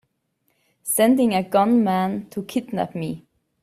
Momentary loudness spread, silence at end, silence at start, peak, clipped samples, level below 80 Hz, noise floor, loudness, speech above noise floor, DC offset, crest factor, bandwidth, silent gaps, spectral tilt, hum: 14 LU; 0.45 s; 0.85 s; -4 dBFS; under 0.1%; -62 dBFS; -71 dBFS; -21 LUFS; 50 dB; under 0.1%; 18 dB; 16 kHz; none; -5 dB/octave; none